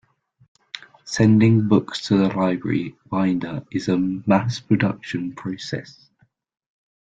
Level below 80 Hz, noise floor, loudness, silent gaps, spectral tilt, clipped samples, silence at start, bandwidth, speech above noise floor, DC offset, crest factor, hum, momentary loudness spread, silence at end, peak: -56 dBFS; -41 dBFS; -21 LUFS; none; -7 dB/octave; under 0.1%; 0.75 s; 9 kHz; 21 dB; under 0.1%; 18 dB; none; 15 LU; 1.2 s; -2 dBFS